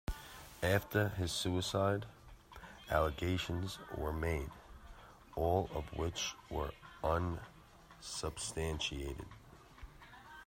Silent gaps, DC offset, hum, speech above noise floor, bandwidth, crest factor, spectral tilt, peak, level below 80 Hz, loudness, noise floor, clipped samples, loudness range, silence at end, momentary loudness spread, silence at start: none; under 0.1%; none; 22 dB; 16 kHz; 22 dB; -4.5 dB/octave; -16 dBFS; -52 dBFS; -38 LUFS; -59 dBFS; under 0.1%; 4 LU; 0.05 s; 22 LU; 0.1 s